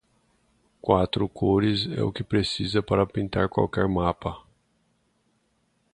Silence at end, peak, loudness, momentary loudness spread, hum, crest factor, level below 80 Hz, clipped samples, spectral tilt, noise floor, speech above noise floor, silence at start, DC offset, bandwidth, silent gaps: 1.55 s; -4 dBFS; -25 LUFS; 7 LU; none; 22 dB; -46 dBFS; under 0.1%; -7 dB/octave; -70 dBFS; 45 dB; 0.85 s; under 0.1%; 10.5 kHz; none